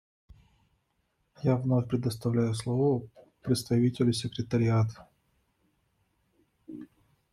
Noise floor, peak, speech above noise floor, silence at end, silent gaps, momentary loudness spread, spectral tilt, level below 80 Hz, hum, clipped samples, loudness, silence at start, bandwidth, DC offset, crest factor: -75 dBFS; -12 dBFS; 48 dB; 0.45 s; none; 16 LU; -7 dB/octave; -62 dBFS; none; under 0.1%; -29 LUFS; 1.4 s; 13 kHz; under 0.1%; 18 dB